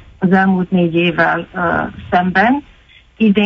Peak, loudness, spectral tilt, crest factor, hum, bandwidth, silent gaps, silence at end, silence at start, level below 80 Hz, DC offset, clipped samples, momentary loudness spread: 0 dBFS; -15 LUFS; -8.5 dB/octave; 14 dB; none; 5.8 kHz; none; 0 s; 0.2 s; -44 dBFS; under 0.1%; under 0.1%; 5 LU